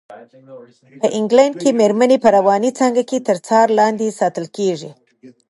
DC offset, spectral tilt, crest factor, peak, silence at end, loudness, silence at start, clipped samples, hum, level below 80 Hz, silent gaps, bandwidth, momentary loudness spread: under 0.1%; -5 dB/octave; 16 dB; 0 dBFS; 0.2 s; -15 LUFS; 0.1 s; under 0.1%; none; -66 dBFS; none; 11.5 kHz; 8 LU